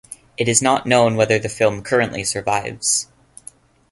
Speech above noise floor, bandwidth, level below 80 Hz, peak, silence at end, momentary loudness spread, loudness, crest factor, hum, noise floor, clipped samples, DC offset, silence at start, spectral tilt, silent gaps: 27 dB; 12 kHz; -52 dBFS; 0 dBFS; 0.9 s; 7 LU; -18 LUFS; 20 dB; none; -45 dBFS; under 0.1%; under 0.1%; 0.1 s; -3.5 dB/octave; none